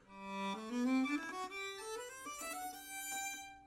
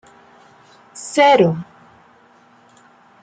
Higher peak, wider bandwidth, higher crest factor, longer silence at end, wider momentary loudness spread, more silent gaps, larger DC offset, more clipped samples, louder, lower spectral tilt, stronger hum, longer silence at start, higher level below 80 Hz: second, -26 dBFS vs -2 dBFS; first, 16 kHz vs 9.4 kHz; about the same, 16 dB vs 18 dB; second, 0 s vs 1.6 s; second, 10 LU vs 28 LU; neither; neither; neither; second, -41 LUFS vs -15 LUFS; second, -3 dB/octave vs -5 dB/octave; neither; second, 0 s vs 0.95 s; second, -76 dBFS vs -64 dBFS